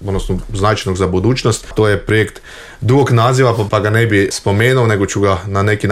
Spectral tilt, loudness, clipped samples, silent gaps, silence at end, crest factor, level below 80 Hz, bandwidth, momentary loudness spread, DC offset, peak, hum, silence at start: -6 dB/octave; -14 LUFS; under 0.1%; none; 0 s; 12 dB; -32 dBFS; 14 kHz; 8 LU; under 0.1%; -2 dBFS; none; 0 s